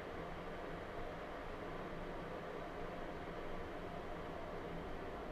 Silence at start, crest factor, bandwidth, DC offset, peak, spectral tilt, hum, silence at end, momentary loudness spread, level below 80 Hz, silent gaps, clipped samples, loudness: 0 s; 12 dB; 13.5 kHz; under 0.1%; -34 dBFS; -6.5 dB/octave; none; 0 s; 1 LU; -54 dBFS; none; under 0.1%; -48 LUFS